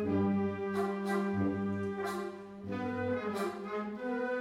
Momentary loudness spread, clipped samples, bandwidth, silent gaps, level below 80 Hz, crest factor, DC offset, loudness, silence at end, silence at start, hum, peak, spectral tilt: 7 LU; under 0.1%; 15 kHz; none; -70 dBFS; 14 dB; under 0.1%; -35 LUFS; 0 s; 0 s; none; -20 dBFS; -7.5 dB/octave